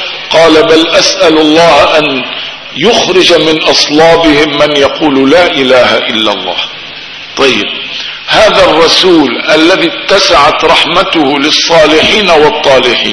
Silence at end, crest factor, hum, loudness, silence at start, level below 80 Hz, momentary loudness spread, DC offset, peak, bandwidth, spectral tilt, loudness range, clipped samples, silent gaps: 0 s; 6 dB; none; -5 LUFS; 0 s; -36 dBFS; 9 LU; under 0.1%; 0 dBFS; 11 kHz; -3 dB/octave; 3 LU; 6%; none